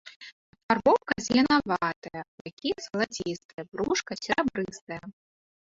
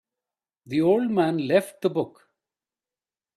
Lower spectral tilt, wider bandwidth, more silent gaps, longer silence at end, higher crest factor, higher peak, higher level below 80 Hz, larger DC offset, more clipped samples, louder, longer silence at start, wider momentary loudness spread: second, -4 dB/octave vs -7 dB/octave; second, 7.8 kHz vs 14 kHz; first, 0.16-0.20 s, 0.32-0.53 s, 0.63-0.69 s, 1.96-2.02 s, 2.28-2.45 s, 2.53-2.57 s, 3.45-3.58 s, 4.81-4.87 s vs none; second, 0.5 s vs 1.25 s; about the same, 20 dB vs 18 dB; about the same, -8 dBFS vs -8 dBFS; first, -60 dBFS vs -70 dBFS; neither; neither; second, -27 LUFS vs -24 LUFS; second, 0.05 s vs 0.7 s; first, 18 LU vs 8 LU